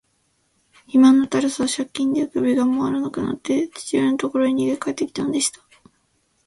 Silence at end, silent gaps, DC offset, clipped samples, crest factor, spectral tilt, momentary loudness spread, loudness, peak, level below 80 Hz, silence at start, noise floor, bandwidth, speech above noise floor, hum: 0.95 s; none; under 0.1%; under 0.1%; 16 dB; -4 dB/octave; 9 LU; -20 LUFS; -4 dBFS; -60 dBFS; 0.95 s; -66 dBFS; 11.5 kHz; 47 dB; none